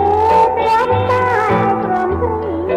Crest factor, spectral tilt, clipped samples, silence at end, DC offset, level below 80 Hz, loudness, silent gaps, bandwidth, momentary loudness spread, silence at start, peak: 12 dB; -7 dB/octave; under 0.1%; 0 s; under 0.1%; -36 dBFS; -14 LUFS; none; 13 kHz; 6 LU; 0 s; -2 dBFS